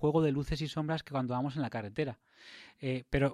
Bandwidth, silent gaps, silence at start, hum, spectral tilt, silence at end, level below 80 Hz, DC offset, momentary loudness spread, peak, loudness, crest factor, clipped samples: 12 kHz; none; 0 s; none; -7.5 dB/octave; 0 s; -50 dBFS; under 0.1%; 21 LU; -18 dBFS; -34 LUFS; 16 dB; under 0.1%